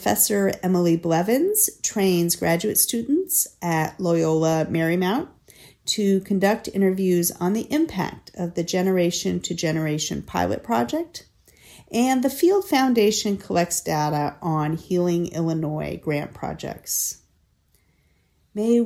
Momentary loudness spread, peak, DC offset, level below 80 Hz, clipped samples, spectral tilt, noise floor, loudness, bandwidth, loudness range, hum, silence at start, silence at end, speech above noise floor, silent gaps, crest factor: 9 LU; -4 dBFS; under 0.1%; -56 dBFS; under 0.1%; -4.5 dB/octave; -64 dBFS; -22 LUFS; 17 kHz; 5 LU; none; 0 s; 0 s; 42 dB; none; 18 dB